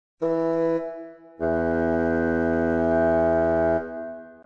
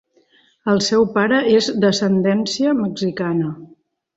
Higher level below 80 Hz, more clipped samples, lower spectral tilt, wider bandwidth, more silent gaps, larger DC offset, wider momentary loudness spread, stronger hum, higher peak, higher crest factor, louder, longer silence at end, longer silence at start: first, -46 dBFS vs -58 dBFS; neither; first, -9.5 dB/octave vs -5 dB/octave; second, 6.8 kHz vs 8 kHz; neither; first, 0.2% vs under 0.1%; first, 15 LU vs 8 LU; neither; second, -10 dBFS vs -4 dBFS; about the same, 12 dB vs 16 dB; second, -23 LUFS vs -18 LUFS; second, 0.1 s vs 0.5 s; second, 0.2 s vs 0.65 s